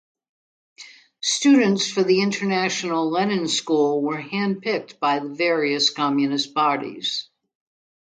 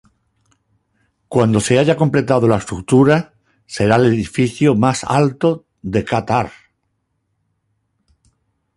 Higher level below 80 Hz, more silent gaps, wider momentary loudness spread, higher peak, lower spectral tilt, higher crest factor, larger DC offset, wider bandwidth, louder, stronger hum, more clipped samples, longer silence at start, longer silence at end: second, -72 dBFS vs -46 dBFS; neither; about the same, 8 LU vs 8 LU; second, -6 dBFS vs 0 dBFS; second, -3.5 dB/octave vs -6.5 dB/octave; about the same, 16 dB vs 16 dB; neither; second, 9.4 kHz vs 11.5 kHz; second, -21 LUFS vs -16 LUFS; neither; neither; second, 0.8 s vs 1.3 s; second, 0.85 s vs 2.25 s